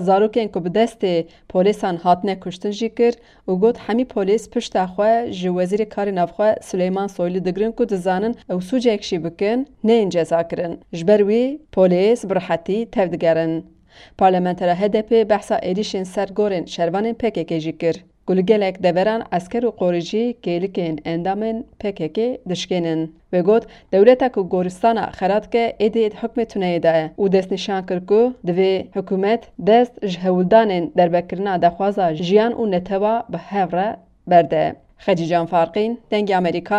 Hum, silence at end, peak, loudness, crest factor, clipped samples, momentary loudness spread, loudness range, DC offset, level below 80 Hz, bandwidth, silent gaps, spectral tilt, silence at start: none; 0 s; 0 dBFS; -19 LUFS; 18 dB; under 0.1%; 8 LU; 3 LU; under 0.1%; -52 dBFS; 11 kHz; none; -6.5 dB/octave; 0 s